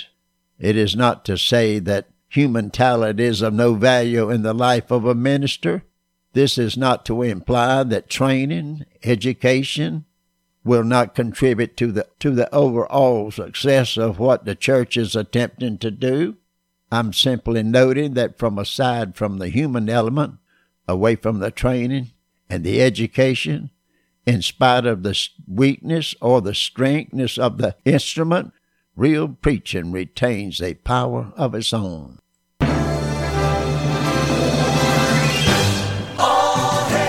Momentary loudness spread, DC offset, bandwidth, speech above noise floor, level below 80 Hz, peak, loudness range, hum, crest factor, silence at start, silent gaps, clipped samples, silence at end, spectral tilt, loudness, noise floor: 8 LU; under 0.1%; 16 kHz; 51 dB; -40 dBFS; -2 dBFS; 4 LU; none; 18 dB; 0 s; none; under 0.1%; 0 s; -5.5 dB/octave; -19 LUFS; -70 dBFS